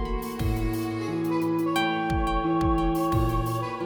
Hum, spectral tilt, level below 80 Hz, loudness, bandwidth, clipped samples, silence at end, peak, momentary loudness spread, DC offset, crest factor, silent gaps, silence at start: none; -6.5 dB/octave; -34 dBFS; -26 LUFS; over 20 kHz; under 0.1%; 0 s; -12 dBFS; 5 LU; under 0.1%; 14 dB; none; 0 s